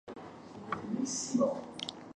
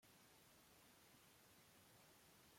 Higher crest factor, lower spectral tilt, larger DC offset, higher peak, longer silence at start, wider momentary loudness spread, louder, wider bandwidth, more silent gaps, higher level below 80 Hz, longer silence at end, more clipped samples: about the same, 18 dB vs 14 dB; about the same, -3.5 dB/octave vs -2.5 dB/octave; neither; first, -18 dBFS vs -56 dBFS; about the same, 0.05 s vs 0 s; first, 17 LU vs 1 LU; first, -35 LUFS vs -69 LUFS; second, 11 kHz vs 16.5 kHz; neither; first, -72 dBFS vs -90 dBFS; about the same, 0.05 s vs 0 s; neither